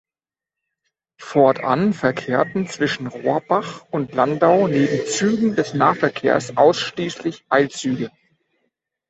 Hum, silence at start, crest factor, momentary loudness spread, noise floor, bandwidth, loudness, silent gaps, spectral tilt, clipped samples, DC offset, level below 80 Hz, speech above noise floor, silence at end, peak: none; 1.2 s; 18 dB; 9 LU; under -90 dBFS; 8.2 kHz; -19 LUFS; none; -5.5 dB/octave; under 0.1%; under 0.1%; -60 dBFS; over 71 dB; 1 s; -2 dBFS